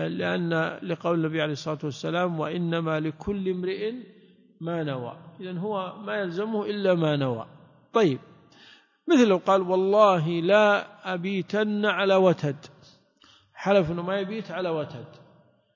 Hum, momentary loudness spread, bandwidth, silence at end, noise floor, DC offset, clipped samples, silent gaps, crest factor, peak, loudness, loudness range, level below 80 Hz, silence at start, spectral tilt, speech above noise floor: none; 13 LU; 7.4 kHz; 0.65 s; -59 dBFS; under 0.1%; under 0.1%; none; 20 dB; -6 dBFS; -25 LUFS; 9 LU; -62 dBFS; 0 s; -6.5 dB/octave; 34 dB